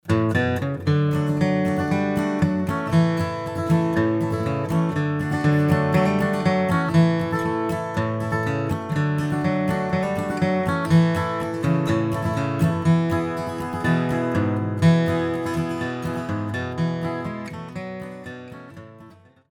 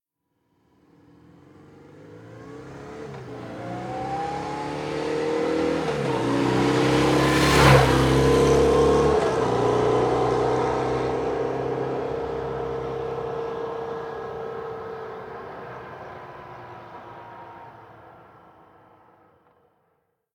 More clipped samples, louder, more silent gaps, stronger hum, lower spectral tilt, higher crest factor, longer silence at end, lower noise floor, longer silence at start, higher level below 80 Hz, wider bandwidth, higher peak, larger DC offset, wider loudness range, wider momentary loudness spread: neither; about the same, -22 LUFS vs -23 LUFS; neither; neither; first, -7.5 dB/octave vs -5.5 dB/octave; second, 16 dB vs 22 dB; second, 0.4 s vs 2.25 s; second, -48 dBFS vs -74 dBFS; second, 0.05 s vs 1.8 s; second, -50 dBFS vs -40 dBFS; second, 15 kHz vs 17.5 kHz; second, -6 dBFS vs -2 dBFS; neither; second, 4 LU vs 22 LU; second, 9 LU vs 22 LU